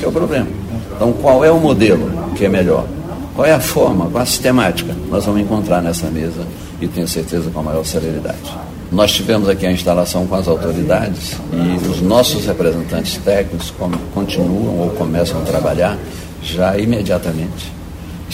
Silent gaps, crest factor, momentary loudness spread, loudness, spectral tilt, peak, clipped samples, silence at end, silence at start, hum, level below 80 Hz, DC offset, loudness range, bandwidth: none; 16 dB; 12 LU; -16 LUFS; -5.5 dB/octave; 0 dBFS; under 0.1%; 0 s; 0 s; none; -32 dBFS; under 0.1%; 5 LU; 16.5 kHz